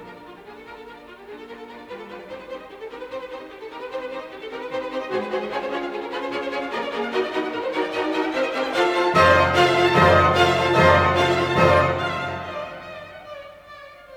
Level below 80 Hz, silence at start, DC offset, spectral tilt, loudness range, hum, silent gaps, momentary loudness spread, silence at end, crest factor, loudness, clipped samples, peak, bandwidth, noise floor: -48 dBFS; 0 s; under 0.1%; -5.5 dB/octave; 19 LU; none; none; 24 LU; 0 s; 18 dB; -20 LUFS; under 0.1%; -4 dBFS; 16.5 kHz; -43 dBFS